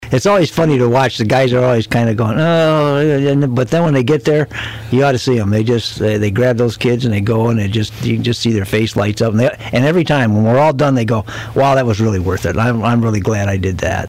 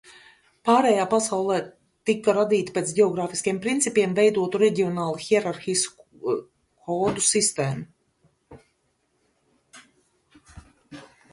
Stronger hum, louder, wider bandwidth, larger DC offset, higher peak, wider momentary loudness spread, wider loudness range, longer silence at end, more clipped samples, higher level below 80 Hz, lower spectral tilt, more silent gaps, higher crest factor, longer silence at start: neither; first, -14 LUFS vs -23 LUFS; first, 15.5 kHz vs 11.5 kHz; neither; about the same, -6 dBFS vs -6 dBFS; second, 5 LU vs 10 LU; second, 2 LU vs 5 LU; second, 0 s vs 0.3 s; neither; first, -40 dBFS vs -62 dBFS; first, -6.5 dB/octave vs -4 dB/octave; neither; second, 8 dB vs 18 dB; about the same, 0 s vs 0.1 s